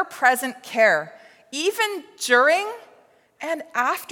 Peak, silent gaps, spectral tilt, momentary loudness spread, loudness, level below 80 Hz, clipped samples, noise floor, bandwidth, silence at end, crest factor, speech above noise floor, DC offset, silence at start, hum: -4 dBFS; none; -1.5 dB/octave; 16 LU; -21 LUFS; -84 dBFS; under 0.1%; -56 dBFS; 17.5 kHz; 0.05 s; 20 dB; 34 dB; under 0.1%; 0 s; none